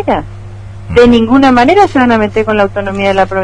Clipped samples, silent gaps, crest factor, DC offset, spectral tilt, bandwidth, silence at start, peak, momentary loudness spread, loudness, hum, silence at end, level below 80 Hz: 1%; none; 10 dB; under 0.1%; -6.5 dB/octave; 10 kHz; 0 s; 0 dBFS; 21 LU; -9 LUFS; none; 0 s; -30 dBFS